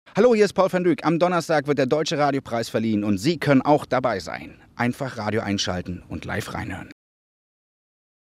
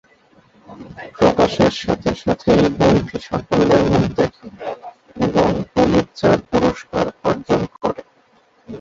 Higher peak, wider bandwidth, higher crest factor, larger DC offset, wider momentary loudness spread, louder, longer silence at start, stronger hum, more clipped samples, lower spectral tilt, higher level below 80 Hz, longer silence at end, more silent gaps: about the same, -4 dBFS vs -2 dBFS; first, 15.5 kHz vs 7.8 kHz; about the same, 18 dB vs 16 dB; neither; about the same, 14 LU vs 16 LU; second, -22 LUFS vs -17 LUFS; second, 0.15 s vs 0.7 s; neither; neither; about the same, -5.5 dB/octave vs -6.5 dB/octave; second, -58 dBFS vs -40 dBFS; first, 1.3 s vs 0 s; neither